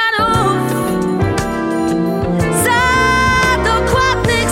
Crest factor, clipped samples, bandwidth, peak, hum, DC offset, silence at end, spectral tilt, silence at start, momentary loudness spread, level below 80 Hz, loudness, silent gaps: 14 dB; under 0.1%; 17 kHz; 0 dBFS; none; under 0.1%; 0 s; -4.5 dB/octave; 0 s; 5 LU; -28 dBFS; -14 LUFS; none